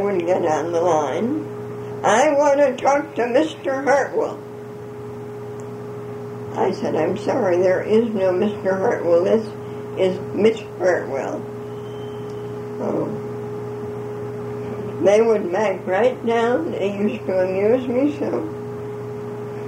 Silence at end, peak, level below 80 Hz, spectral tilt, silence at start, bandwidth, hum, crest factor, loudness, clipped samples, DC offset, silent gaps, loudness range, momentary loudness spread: 0 s; -4 dBFS; -60 dBFS; -6 dB/octave; 0 s; 15.5 kHz; none; 16 dB; -21 LUFS; under 0.1%; under 0.1%; none; 7 LU; 15 LU